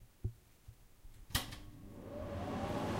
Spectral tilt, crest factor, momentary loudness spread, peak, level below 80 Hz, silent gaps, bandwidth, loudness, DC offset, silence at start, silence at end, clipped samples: -4.5 dB/octave; 24 dB; 22 LU; -20 dBFS; -54 dBFS; none; 16 kHz; -43 LUFS; under 0.1%; 0 s; 0 s; under 0.1%